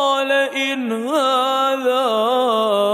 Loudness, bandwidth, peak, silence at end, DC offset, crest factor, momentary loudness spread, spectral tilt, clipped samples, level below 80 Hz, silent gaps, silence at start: -18 LUFS; 16 kHz; -6 dBFS; 0 s; under 0.1%; 12 dB; 4 LU; -3 dB/octave; under 0.1%; -82 dBFS; none; 0 s